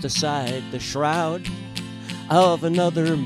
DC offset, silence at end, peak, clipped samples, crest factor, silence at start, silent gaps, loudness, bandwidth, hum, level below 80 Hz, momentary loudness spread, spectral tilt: under 0.1%; 0 s; -4 dBFS; under 0.1%; 18 dB; 0 s; none; -22 LUFS; 14.5 kHz; none; -50 dBFS; 14 LU; -5 dB/octave